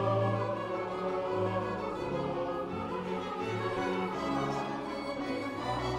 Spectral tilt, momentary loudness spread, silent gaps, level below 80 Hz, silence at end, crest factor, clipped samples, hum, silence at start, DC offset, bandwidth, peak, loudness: -6.5 dB/octave; 4 LU; none; -58 dBFS; 0 s; 14 dB; under 0.1%; none; 0 s; under 0.1%; 13 kHz; -18 dBFS; -34 LUFS